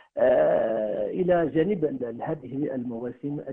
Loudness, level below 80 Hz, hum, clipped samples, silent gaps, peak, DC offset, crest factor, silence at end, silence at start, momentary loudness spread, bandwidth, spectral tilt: -26 LUFS; -58 dBFS; none; under 0.1%; none; -10 dBFS; under 0.1%; 16 dB; 0 s; 0.15 s; 12 LU; 3.8 kHz; -10 dB/octave